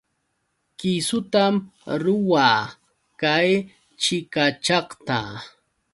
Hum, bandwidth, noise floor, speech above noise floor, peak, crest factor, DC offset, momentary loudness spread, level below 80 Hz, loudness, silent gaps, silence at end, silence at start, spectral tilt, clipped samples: none; 11.5 kHz; -73 dBFS; 52 dB; -4 dBFS; 20 dB; under 0.1%; 11 LU; -62 dBFS; -22 LUFS; none; 0.45 s; 0.8 s; -4 dB/octave; under 0.1%